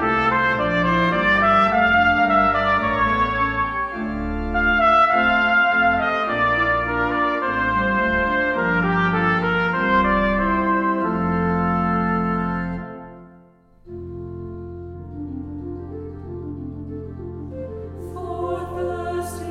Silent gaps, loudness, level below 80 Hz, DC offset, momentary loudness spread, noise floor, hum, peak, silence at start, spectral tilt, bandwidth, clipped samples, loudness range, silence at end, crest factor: none; -19 LUFS; -38 dBFS; under 0.1%; 18 LU; -51 dBFS; none; -6 dBFS; 0 s; -7 dB/octave; 13 kHz; under 0.1%; 15 LU; 0 s; 16 dB